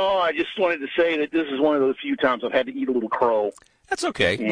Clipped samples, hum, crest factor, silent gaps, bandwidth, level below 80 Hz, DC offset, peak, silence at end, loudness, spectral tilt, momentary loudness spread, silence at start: under 0.1%; none; 16 dB; none; 10.5 kHz; -56 dBFS; under 0.1%; -6 dBFS; 0 s; -23 LUFS; -4.5 dB/octave; 4 LU; 0 s